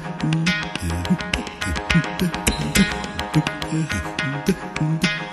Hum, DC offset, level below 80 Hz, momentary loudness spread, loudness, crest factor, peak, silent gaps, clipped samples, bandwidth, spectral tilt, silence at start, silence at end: none; under 0.1%; -36 dBFS; 6 LU; -22 LUFS; 22 dB; 0 dBFS; none; under 0.1%; 13.5 kHz; -4.5 dB/octave; 0 s; 0 s